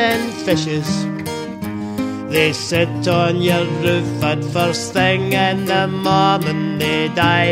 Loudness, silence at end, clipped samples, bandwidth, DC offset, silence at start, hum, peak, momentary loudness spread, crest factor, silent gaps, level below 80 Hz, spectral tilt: -17 LUFS; 0 s; under 0.1%; 16 kHz; under 0.1%; 0 s; none; 0 dBFS; 8 LU; 16 dB; none; -50 dBFS; -5 dB/octave